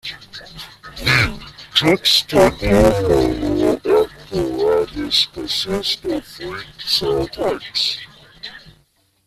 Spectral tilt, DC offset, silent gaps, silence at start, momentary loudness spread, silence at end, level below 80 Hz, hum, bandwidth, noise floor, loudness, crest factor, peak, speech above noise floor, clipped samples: -4.5 dB/octave; under 0.1%; none; 0.05 s; 20 LU; 0.55 s; -36 dBFS; none; 15 kHz; -59 dBFS; -17 LUFS; 18 dB; 0 dBFS; 41 dB; under 0.1%